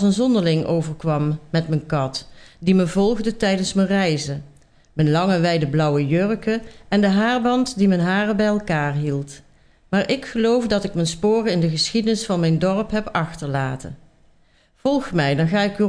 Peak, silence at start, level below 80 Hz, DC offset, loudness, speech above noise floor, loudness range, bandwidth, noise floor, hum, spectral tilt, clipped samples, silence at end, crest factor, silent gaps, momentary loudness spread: -4 dBFS; 0 s; -46 dBFS; under 0.1%; -20 LUFS; 37 dB; 3 LU; 10.5 kHz; -57 dBFS; none; -6 dB/octave; under 0.1%; 0 s; 16 dB; none; 7 LU